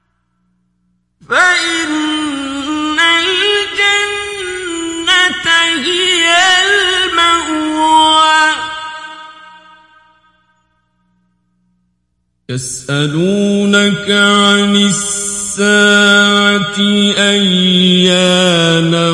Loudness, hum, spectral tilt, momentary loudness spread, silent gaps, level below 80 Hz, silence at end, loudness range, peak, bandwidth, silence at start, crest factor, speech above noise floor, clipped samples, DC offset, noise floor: -10 LUFS; 60 Hz at -55 dBFS; -3 dB/octave; 12 LU; none; -50 dBFS; 0 s; 9 LU; 0 dBFS; 11.5 kHz; 1.3 s; 12 dB; 54 dB; under 0.1%; under 0.1%; -65 dBFS